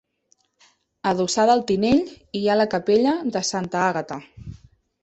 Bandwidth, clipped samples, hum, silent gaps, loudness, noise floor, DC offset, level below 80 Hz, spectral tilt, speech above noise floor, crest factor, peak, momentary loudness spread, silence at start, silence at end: 8.4 kHz; under 0.1%; none; none; -21 LUFS; -66 dBFS; under 0.1%; -52 dBFS; -4.5 dB/octave; 45 dB; 18 dB; -4 dBFS; 16 LU; 1.05 s; 0.5 s